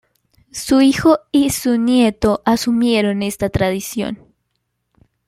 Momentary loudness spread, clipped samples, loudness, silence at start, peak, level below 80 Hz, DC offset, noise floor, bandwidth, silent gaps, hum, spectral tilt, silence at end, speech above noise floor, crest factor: 11 LU; under 0.1%; -16 LUFS; 0.55 s; -2 dBFS; -42 dBFS; under 0.1%; -71 dBFS; 16 kHz; none; none; -5 dB/octave; 1.15 s; 56 dB; 16 dB